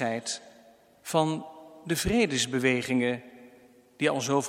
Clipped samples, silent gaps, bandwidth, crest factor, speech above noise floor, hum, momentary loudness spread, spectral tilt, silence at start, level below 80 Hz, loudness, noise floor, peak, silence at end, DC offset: under 0.1%; none; 16.5 kHz; 20 dB; 30 dB; none; 12 LU; -4 dB/octave; 0 s; -52 dBFS; -28 LUFS; -57 dBFS; -10 dBFS; 0 s; under 0.1%